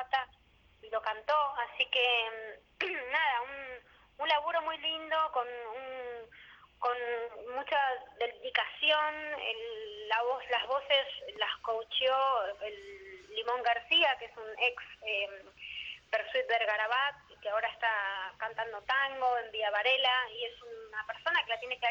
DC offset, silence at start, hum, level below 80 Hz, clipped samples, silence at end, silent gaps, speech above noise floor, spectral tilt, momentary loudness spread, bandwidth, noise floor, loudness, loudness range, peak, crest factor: under 0.1%; 0 s; none; -70 dBFS; under 0.1%; 0 s; none; 31 dB; -2 dB/octave; 14 LU; 7.6 kHz; -64 dBFS; -32 LUFS; 4 LU; -16 dBFS; 18 dB